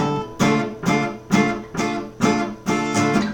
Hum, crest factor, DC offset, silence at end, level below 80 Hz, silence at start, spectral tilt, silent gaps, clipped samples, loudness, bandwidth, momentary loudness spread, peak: none; 16 dB; under 0.1%; 0 s; -48 dBFS; 0 s; -5 dB/octave; none; under 0.1%; -21 LUFS; 18.5 kHz; 5 LU; -4 dBFS